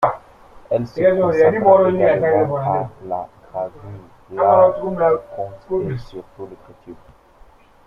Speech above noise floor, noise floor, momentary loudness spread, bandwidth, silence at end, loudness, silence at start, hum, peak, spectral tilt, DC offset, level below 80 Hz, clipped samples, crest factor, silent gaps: 30 dB; -48 dBFS; 22 LU; 6.8 kHz; 0.95 s; -17 LUFS; 0 s; none; -2 dBFS; -9 dB/octave; under 0.1%; -50 dBFS; under 0.1%; 16 dB; none